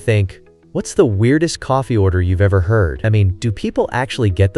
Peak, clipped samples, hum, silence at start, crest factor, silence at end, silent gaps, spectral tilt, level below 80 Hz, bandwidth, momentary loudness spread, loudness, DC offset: 0 dBFS; under 0.1%; none; 0 s; 16 dB; 0 s; none; -7 dB/octave; -34 dBFS; 11.5 kHz; 6 LU; -16 LUFS; under 0.1%